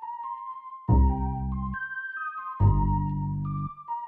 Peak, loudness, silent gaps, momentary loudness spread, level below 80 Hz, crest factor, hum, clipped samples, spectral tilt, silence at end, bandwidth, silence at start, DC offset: -10 dBFS; -28 LUFS; none; 13 LU; -32 dBFS; 18 dB; none; under 0.1%; -12 dB/octave; 0 s; 3.3 kHz; 0 s; under 0.1%